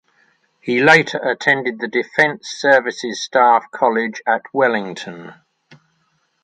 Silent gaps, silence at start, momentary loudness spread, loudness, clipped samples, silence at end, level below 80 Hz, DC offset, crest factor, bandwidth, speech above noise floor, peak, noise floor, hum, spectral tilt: none; 0.65 s; 13 LU; -16 LUFS; under 0.1%; 1.1 s; -68 dBFS; under 0.1%; 18 dB; 10.5 kHz; 48 dB; 0 dBFS; -65 dBFS; none; -4 dB/octave